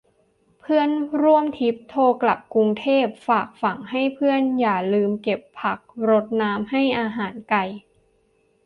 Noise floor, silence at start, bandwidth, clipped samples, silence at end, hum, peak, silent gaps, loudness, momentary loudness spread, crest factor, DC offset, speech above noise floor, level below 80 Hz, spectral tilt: -63 dBFS; 0.7 s; 5.4 kHz; under 0.1%; 0.85 s; none; -6 dBFS; none; -21 LUFS; 8 LU; 16 dB; under 0.1%; 42 dB; -64 dBFS; -8 dB/octave